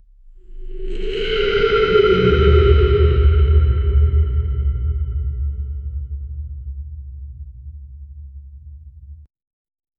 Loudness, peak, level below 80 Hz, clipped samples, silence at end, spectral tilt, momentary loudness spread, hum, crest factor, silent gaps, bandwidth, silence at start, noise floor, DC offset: -17 LUFS; 0 dBFS; -20 dBFS; under 0.1%; 0.75 s; -8.5 dB/octave; 24 LU; none; 18 dB; none; 5.2 kHz; 0.3 s; -42 dBFS; under 0.1%